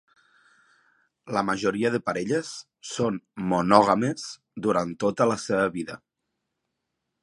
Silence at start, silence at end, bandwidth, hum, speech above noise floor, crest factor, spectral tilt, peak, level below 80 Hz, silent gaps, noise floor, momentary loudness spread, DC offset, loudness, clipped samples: 1.25 s; 1.25 s; 11.5 kHz; none; 57 dB; 26 dB; -5.5 dB/octave; 0 dBFS; -62 dBFS; none; -81 dBFS; 17 LU; under 0.1%; -25 LUFS; under 0.1%